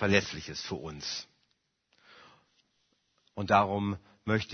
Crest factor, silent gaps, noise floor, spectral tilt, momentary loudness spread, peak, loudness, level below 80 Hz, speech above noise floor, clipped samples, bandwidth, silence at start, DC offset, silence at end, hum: 24 dB; none; -76 dBFS; -5 dB/octave; 14 LU; -8 dBFS; -31 LUFS; -60 dBFS; 46 dB; under 0.1%; 6.6 kHz; 0 s; under 0.1%; 0 s; none